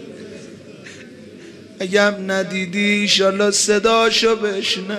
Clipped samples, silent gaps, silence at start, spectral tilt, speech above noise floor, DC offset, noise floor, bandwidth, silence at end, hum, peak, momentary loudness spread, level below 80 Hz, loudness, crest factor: under 0.1%; none; 0 s; -2.5 dB/octave; 22 dB; under 0.1%; -39 dBFS; 14 kHz; 0 s; none; 0 dBFS; 23 LU; -56 dBFS; -16 LUFS; 18 dB